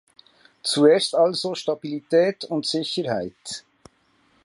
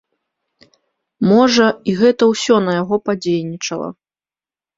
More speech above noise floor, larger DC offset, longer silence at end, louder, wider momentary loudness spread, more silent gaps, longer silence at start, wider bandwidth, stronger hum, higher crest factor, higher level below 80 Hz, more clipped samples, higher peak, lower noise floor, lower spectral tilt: second, 41 dB vs over 75 dB; neither; about the same, 0.85 s vs 0.85 s; second, -22 LUFS vs -15 LUFS; first, 15 LU vs 11 LU; neither; second, 0.65 s vs 1.2 s; first, 11.5 kHz vs 7.8 kHz; neither; about the same, 20 dB vs 16 dB; second, -68 dBFS vs -58 dBFS; neither; about the same, -4 dBFS vs -2 dBFS; second, -63 dBFS vs under -90 dBFS; about the same, -4 dB/octave vs -5 dB/octave